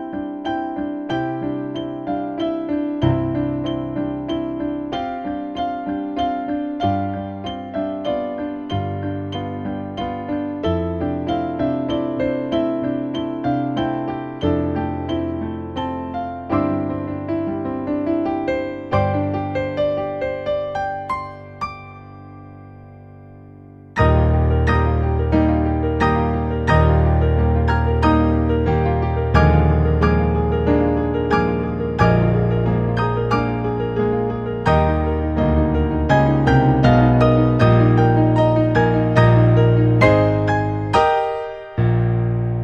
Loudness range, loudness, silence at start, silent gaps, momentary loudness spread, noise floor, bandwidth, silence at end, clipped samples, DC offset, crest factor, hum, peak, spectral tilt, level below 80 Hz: 9 LU; -19 LUFS; 0 s; none; 12 LU; -41 dBFS; 7 kHz; 0 s; under 0.1%; under 0.1%; 18 dB; none; 0 dBFS; -9 dB/octave; -28 dBFS